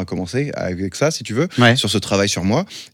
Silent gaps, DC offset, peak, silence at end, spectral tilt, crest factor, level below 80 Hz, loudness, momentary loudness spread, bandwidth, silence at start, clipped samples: none; under 0.1%; 0 dBFS; 0.05 s; -4.5 dB/octave; 18 dB; -54 dBFS; -18 LUFS; 9 LU; 17 kHz; 0 s; under 0.1%